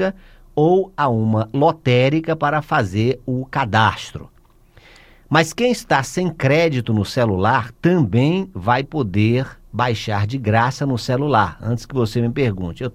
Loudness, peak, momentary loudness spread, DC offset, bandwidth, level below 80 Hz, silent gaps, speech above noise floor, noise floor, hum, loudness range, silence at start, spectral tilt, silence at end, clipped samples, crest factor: -19 LUFS; 0 dBFS; 6 LU; under 0.1%; 14.5 kHz; -46 dBFS; none; 32 dB; -50 dBFS; none; 2 LU; 0 s; -6.5 dB/octave; 0.05 s; under 0.1%; 18 dB